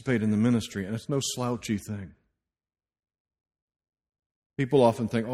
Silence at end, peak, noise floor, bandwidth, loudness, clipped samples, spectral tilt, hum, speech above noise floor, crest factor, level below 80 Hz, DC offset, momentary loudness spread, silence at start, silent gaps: 0 s; -6 dBFS; -80 dBFS; 13.5 kHz; -27 LUFS; under 0.1%; -6 dB/octave; none; 54 dB; 22 dB; -60 dBFS; under 0.1%; 16 LU; 0 s; 3.20-3.25 s, 3.62-3.68 s, 4.26-4.30 s, 4.36-4.50 s